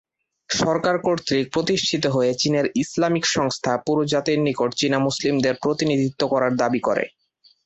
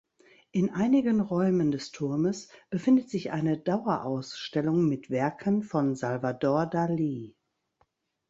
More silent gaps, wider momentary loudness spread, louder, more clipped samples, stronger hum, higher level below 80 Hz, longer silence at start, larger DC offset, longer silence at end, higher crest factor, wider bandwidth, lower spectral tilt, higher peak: neither; second, 2 LU vs 8 LU; first, -21 LUFS vs -28 LUFS; neither; neither; first, -58 dBFS vs -66 dBFS; about the same, 0.5 s vs 0.55 s; neither; second, 0.55 s vs 1 s; about the same, 16 dB vs 16 dB; about the same, 8.2 kHz vs 8 kHz; second, -4.5 dB/octave vs -7.5 dB/octave; first, -6 dBFS vs -12 dBFS